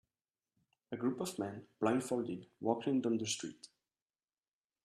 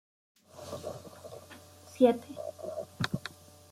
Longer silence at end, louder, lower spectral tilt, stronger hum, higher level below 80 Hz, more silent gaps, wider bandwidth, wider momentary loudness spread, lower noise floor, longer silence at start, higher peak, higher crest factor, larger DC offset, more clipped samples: first, 1.2 s vs 0.4 s; second, -37 LUFS vs -33 LUFS; second, -4.5 dB/octave vs -6 dB/octave; neither; second, -80 dBFS vs -70 dBFS; neither; second, 13 kHz vs 15.5 kHz; second, 10 LU vs 25 LU; first, under -90 dBFS vs -53 dBFS; first, 0.9 s vs 0.55 s; second, -18 dBFS vs -10 dBFS; about the same, 22 dB vs 24 dB; neither; neither